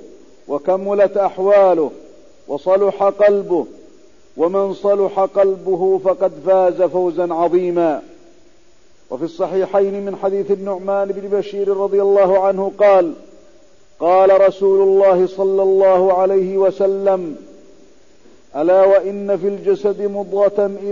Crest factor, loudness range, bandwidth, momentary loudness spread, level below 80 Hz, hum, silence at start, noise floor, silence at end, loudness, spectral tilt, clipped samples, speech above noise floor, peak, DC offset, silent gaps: 12 dB; 6 LU; 7.2 kHz; 9 LU; -58 dBFS; none; 0 s; -53 dBFS; 0 s; -16 LUFS; -7.5 dB/octave; under 0.1%; 38 dB; -4 dBFS; 0.6%; none